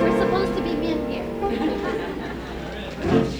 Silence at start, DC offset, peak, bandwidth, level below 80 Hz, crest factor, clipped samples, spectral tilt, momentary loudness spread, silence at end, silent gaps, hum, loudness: 0 s; under 0.1%; -6 dBFS; over 20 kHz; -40 dBFS; 18 dB; under 0.1%; -6.5 dB/octave; 10 LU; 0 s; none; none; -25 LUFS